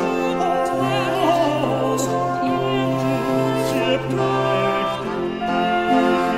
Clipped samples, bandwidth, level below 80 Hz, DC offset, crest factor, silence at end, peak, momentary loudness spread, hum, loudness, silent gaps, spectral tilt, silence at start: under 0.1%; 16 kHz; -48 dBFS; under 0.1%; 14 dB; 0 s; -6 dBFS; 4 LU; none; -20 LUFS; none; -5.5 dB/octave; 0 s